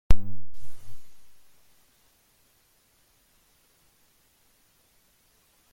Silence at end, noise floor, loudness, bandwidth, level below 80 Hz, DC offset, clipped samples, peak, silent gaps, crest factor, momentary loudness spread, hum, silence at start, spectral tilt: 4.45 s; -65 dBFS; -37 LUFS; 11.5 kHz; -38 dBFS; under 0.1%; under 0.1%; -2 dBFS; none; 22 dB; 15 LU; none; 0.1 s; -6.5 dB/octave